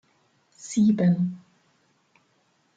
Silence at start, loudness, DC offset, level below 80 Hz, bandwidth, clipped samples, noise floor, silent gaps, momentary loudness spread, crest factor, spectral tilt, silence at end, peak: 0.6 s; -23 LUFS; under 0.1%; -70 dBFS; 9 kHz; under 0.1%; -67 dBFS; none; 24 LU; 16 dB; -7.5 dB/octave; 1.4 s; -12 dBFS